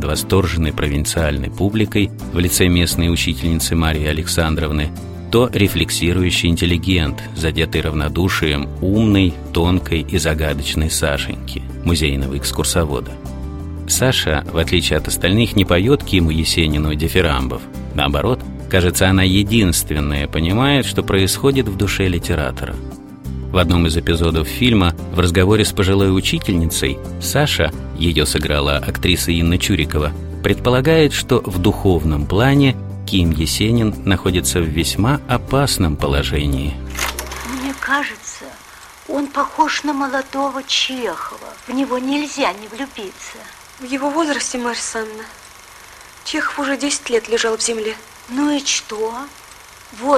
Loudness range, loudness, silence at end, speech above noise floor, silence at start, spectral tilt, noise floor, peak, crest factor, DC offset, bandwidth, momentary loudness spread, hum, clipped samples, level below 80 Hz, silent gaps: 6 LU; -17 LUFS; 0 s; 24 dB; 0 s; -4.5 dB/octave; -40 dBFS; 0 dBFS; 16 dB; under 0.1%; 16.5 kHz; 12 LU; none; under 0.1%; -28 dBFS; none